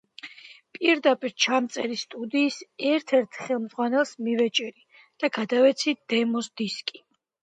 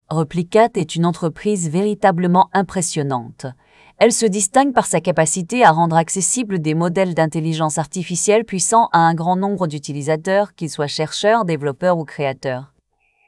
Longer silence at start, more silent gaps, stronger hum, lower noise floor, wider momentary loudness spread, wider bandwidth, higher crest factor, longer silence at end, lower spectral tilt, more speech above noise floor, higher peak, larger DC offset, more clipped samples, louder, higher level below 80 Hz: first, 0.25 s vs 0.1 s; neither; neither; second, -48 dBFS vs -63 dBFS; first, 12 LU vs 9 LU; second, 9.4 kHz vs 12 kHz; about the same, 18 dB vs 18 dB; about the same, 0.6 s vs 0.65 s; second, -3 dB/octave vs -4.5 dB/octave; second, 23 dB vs 46 dB; second, -8 dBFS vs 0 dBFS; neither; neither; second, -25 LUFS vs -17 LUFS; second, -80 dBFS vs -56 dBFS